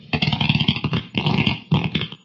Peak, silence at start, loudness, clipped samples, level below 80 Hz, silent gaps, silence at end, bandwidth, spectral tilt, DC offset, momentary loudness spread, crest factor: -2 dBFS; 0.05 s; -21 LUFS; under 0.1%; -44 dBFS; none; 0.1 s; 7 kHz; -7 dB/octave; under 0.1%; 5 LU; 20 dB